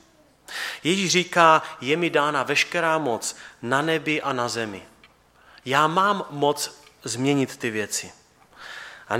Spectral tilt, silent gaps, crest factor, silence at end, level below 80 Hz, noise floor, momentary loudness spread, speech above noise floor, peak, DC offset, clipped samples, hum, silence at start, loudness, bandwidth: -3.5 dB/octave; none; 22 dB; 0 s; -68 dBFS; -55 dBFS; 19 LU; 33 dB; -2 dBFS; under 0.1%; under 0.1%; none; 0.5 s; -23 LUFS; 17 kHz